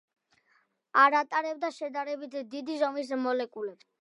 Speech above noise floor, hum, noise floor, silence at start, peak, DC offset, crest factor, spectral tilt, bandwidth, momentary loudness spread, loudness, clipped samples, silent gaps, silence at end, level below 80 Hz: 41 dB; none; -70 dBFS; 0.95 s; -8 dBFS; under 0.1%; 22 dB; -3 dB/octave; 11 kHz; 15 LU; -29 LUFS; under 0.1%; none; 0.3 s; under -90 dBFS